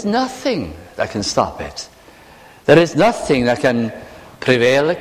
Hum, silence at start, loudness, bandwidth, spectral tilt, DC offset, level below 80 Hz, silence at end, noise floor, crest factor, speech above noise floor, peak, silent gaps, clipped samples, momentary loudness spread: none; 0 s; -16 LUFS; 15.5 kHz; -5 dB/octave; under 0.1%; -44 dBFS; 0 s; -43 dBFS; 18 dB; 28 dB; 0 dBFS; none; under 0.1%; 16 LU